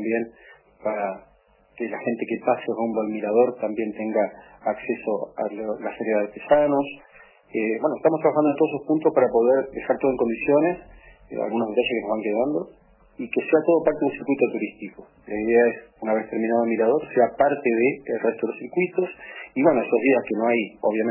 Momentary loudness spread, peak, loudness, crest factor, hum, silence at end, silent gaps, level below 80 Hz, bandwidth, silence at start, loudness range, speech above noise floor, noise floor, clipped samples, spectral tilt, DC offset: 11 LU; -4 dBFS; -23 LUFS; 18 dB; none; 0 s; none; -60 dBFS; 3.1 kHz; 0 s; 4 LU; 31 dB; -54 dBFS; under 0.1%; -10.5 dB/octave; under 0.1%